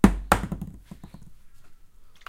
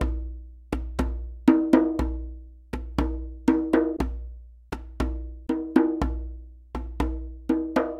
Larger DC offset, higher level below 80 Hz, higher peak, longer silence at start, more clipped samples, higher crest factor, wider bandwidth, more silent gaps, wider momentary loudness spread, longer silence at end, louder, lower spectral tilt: neither; about the same, -34 dBFS vs -34 dBFS; first, 0 dBFS vs -4 dBFS; about the same, 0.05 s vs 0 s; neither; about the same, 26 dB vs 24 dB; first, 16.5 kHz vs 12 kHz; neither; first, 24 LU vs 18 LU; first, 0.15 s vs 0 s; about the same, -25 LUFS vs -26 LUFS; second, -6 dB/octave vs -8 dB/octave